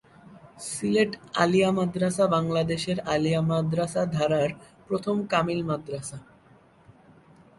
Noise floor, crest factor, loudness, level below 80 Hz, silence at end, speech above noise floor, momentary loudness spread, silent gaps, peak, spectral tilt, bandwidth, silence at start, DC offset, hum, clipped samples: -56 dBFS; 20 dB; -26 LUFS; -58 dBFS; 0.65 s; 31 dB; 12 LU; none; -6 dBFS; -5.5 dB/octave; 11.5 kHz; 0.25 s; under 0.1%; none; under 0.1%